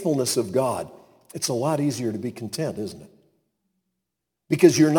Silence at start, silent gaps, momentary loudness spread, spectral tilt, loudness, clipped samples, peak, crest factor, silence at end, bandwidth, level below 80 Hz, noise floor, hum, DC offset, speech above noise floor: 0 s; none; 17 LU; -5 dB/octave; -24 LUFS; under 0.1%; -2 dBFS; 22 dB; 0 s; 19 kHz; -66 dBFS; -82 dBFS; none; under 0.1%; 60 dB